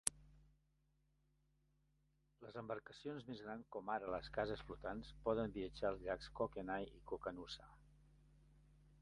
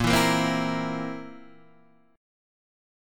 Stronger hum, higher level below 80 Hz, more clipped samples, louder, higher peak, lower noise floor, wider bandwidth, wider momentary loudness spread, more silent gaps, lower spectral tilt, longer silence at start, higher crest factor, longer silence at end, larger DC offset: neither; second, -64 dBFS vs -48 dBFS; neither; second, -47 LUFS vs -25 LUFS; second, -12 dBFS vs -8 dBFS; first, -80 dBFS vs -59 dBFS; second, 11 kHz vs 17.5 kHz; second, 10 LU vs 18 LU; neither; about the same, -4 dB/octave vs -4.5 dB/octave; about the same, 0.05 s vs 0 s; first, 36 dB vs 20 dB; second, 0 s vs 0.95 s; neither